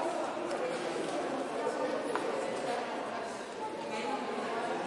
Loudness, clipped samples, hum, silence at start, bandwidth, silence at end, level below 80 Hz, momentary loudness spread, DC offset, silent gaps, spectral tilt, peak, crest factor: -36 LUFS; under 0.1%; none; 0 s; 11.5 kHz; 0 s; -76 dBFS; 4 LU; under 0.1%; none; -4 dB/octave; -16 dBFS; 18 dB